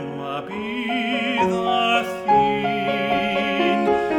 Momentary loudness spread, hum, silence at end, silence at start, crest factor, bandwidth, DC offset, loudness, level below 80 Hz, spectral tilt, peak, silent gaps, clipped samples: 10 LU; none; 0 s; 0 s; 14 dB; 17 kHz; under 0.1%; -21 LUFS; -54 dBFS; -5.5 dB/octave; -6 dBFS; none; under 0.1%